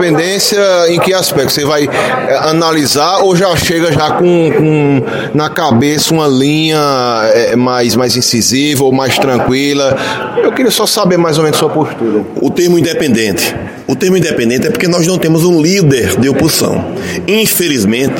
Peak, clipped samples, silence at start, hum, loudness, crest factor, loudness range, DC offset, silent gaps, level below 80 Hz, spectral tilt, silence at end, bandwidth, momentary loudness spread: 0 dBFS; under 0.1%; 0 s; none; -10 LUFS; 10 dB; 1 LU; under 0.1%; none; -42 dBFS; -4.5 dB/octave; 0 s; 17 kHz; 5 LU